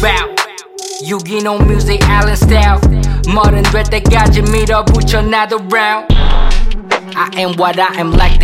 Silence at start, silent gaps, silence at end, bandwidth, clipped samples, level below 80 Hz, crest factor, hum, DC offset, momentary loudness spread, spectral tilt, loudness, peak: 0 s; none; 0 s; 15.5 kHz; under 0.1%; -12 dBFS; 10 dB; none; under 0.1%; 8 LU; -5.5 dB/octave; -12 LUFS; 0 dBFS